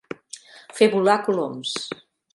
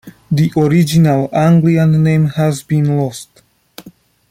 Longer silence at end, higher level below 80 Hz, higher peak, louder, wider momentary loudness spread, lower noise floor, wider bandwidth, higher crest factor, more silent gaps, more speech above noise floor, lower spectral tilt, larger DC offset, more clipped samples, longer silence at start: about the same, 0.4 s vs 0.4 s; second, -72 dBFS vs -48 dBFS; about the same, -4 dBFS vs -2 dBFS; second, -21 LUFS vs -13 LUFS; first, 21 LU vs 7 LU; about the same, -44 dBFS vs -42 dBFS; second, 11.5 kHz vs 15.5 kHz; first, 20 dB vs 12 dB; neither; second, 24 dB vs 30 dB; second, -4 dB/octave vs -7.5 dB/octave; neither; neither; first, 0.35 s vs 0.05 s